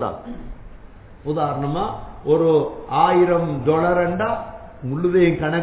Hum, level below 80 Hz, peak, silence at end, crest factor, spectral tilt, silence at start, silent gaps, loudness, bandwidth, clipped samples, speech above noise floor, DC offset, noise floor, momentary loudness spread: none; -42 dBFS; -4 dBFS; 0 s; 16 dB; -11.5 dB/octave; 0 s; none; -20 LUFS; 4 kHz; under 0.1%; 22 dB; under 0.1%; -41 dBFS; 17 LU